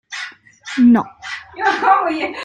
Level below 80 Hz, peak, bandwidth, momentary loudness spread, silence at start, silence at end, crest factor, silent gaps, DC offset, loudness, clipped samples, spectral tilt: -60 dBFS; -2 dBFS; 8.8 kHz; 17 LU; 0.1 s; 0 s; 16 dB; none; under 0.1%; -15 LUFS; under 0.1%; -4.5 dB/octave